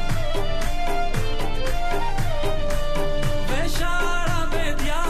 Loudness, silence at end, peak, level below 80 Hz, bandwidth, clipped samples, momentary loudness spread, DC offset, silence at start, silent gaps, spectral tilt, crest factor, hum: -26 LUFS; 0 s; -10 dBFS; -22 dBFS; 14 kHz; under 0.1%; 3 LU; under 0.1%; 0 s; none; -4.5 dB/octave; 10 dB; none